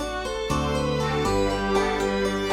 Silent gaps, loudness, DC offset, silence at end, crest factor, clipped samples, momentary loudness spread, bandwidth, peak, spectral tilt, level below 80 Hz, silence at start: none; -24 LUFS; under 0.1%; 0 s; 14 dB; under 0.1%; 3 LU; 16.5 kHz; -10 dBFS; -5 dB/octave; -36 dBFS; 0 s